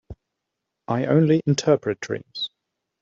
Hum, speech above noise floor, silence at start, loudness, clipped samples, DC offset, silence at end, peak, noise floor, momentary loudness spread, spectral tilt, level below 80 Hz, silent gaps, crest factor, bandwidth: none; 61 dB; 0.1 s; -22 LUFS; under 0.1%; under 0.1%; 0.55 s; -6 dBFS; -82 dBFS; 12 LU; -6 dB/octave; -56 dBFS; none; 18 dB; 7.6 kHz